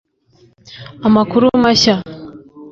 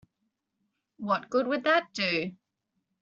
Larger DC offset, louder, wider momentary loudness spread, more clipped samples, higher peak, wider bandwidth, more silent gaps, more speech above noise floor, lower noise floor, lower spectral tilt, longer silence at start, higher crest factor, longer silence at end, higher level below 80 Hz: neither; first, -13 LUFS vs -28 LUFS; first, 23 LU vs 10 LU; neither; first, -2 dBFS vs -12 dBFS; about the same, 7.6 kHz vs 7.6 kHz; neither; second, 39 dB vs 53 dB; second, -52 dBFS vs -81 dBFS; first, -4.5 dB/octave vs -2 dB/octave; second, 0.7 s vs 1 s; second, 14 dB vs 20 dB; second, 0 s vs 0.7 s; first, -46 dBFS vs -74 dBFS